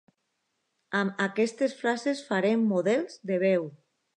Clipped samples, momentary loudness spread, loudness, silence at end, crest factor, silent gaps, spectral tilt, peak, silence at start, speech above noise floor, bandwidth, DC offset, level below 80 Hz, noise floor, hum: under 0.1%; 5 LU; -27 LUFS; 0.4 s; 18 dB; none; -6 dB/octave; -12 dBFS; 0.9 s; 52 dB; 10.5 kHz; under 0.1%; -84 dBFS; -78 dBFS; none